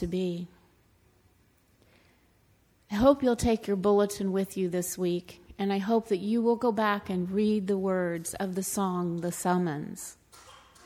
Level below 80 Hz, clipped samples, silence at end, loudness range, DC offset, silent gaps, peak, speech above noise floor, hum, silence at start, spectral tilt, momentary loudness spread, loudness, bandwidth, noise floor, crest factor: -52 dBFS; under 0.1%; 0.3 s; 3 LU; under 0.1%; none; -10 dBFS; 37 dB; none; 0 s; -5.5 dB/octave; 11 LU; -28 LUFS; 19.5 kHz; -65 dBFS; 20 dB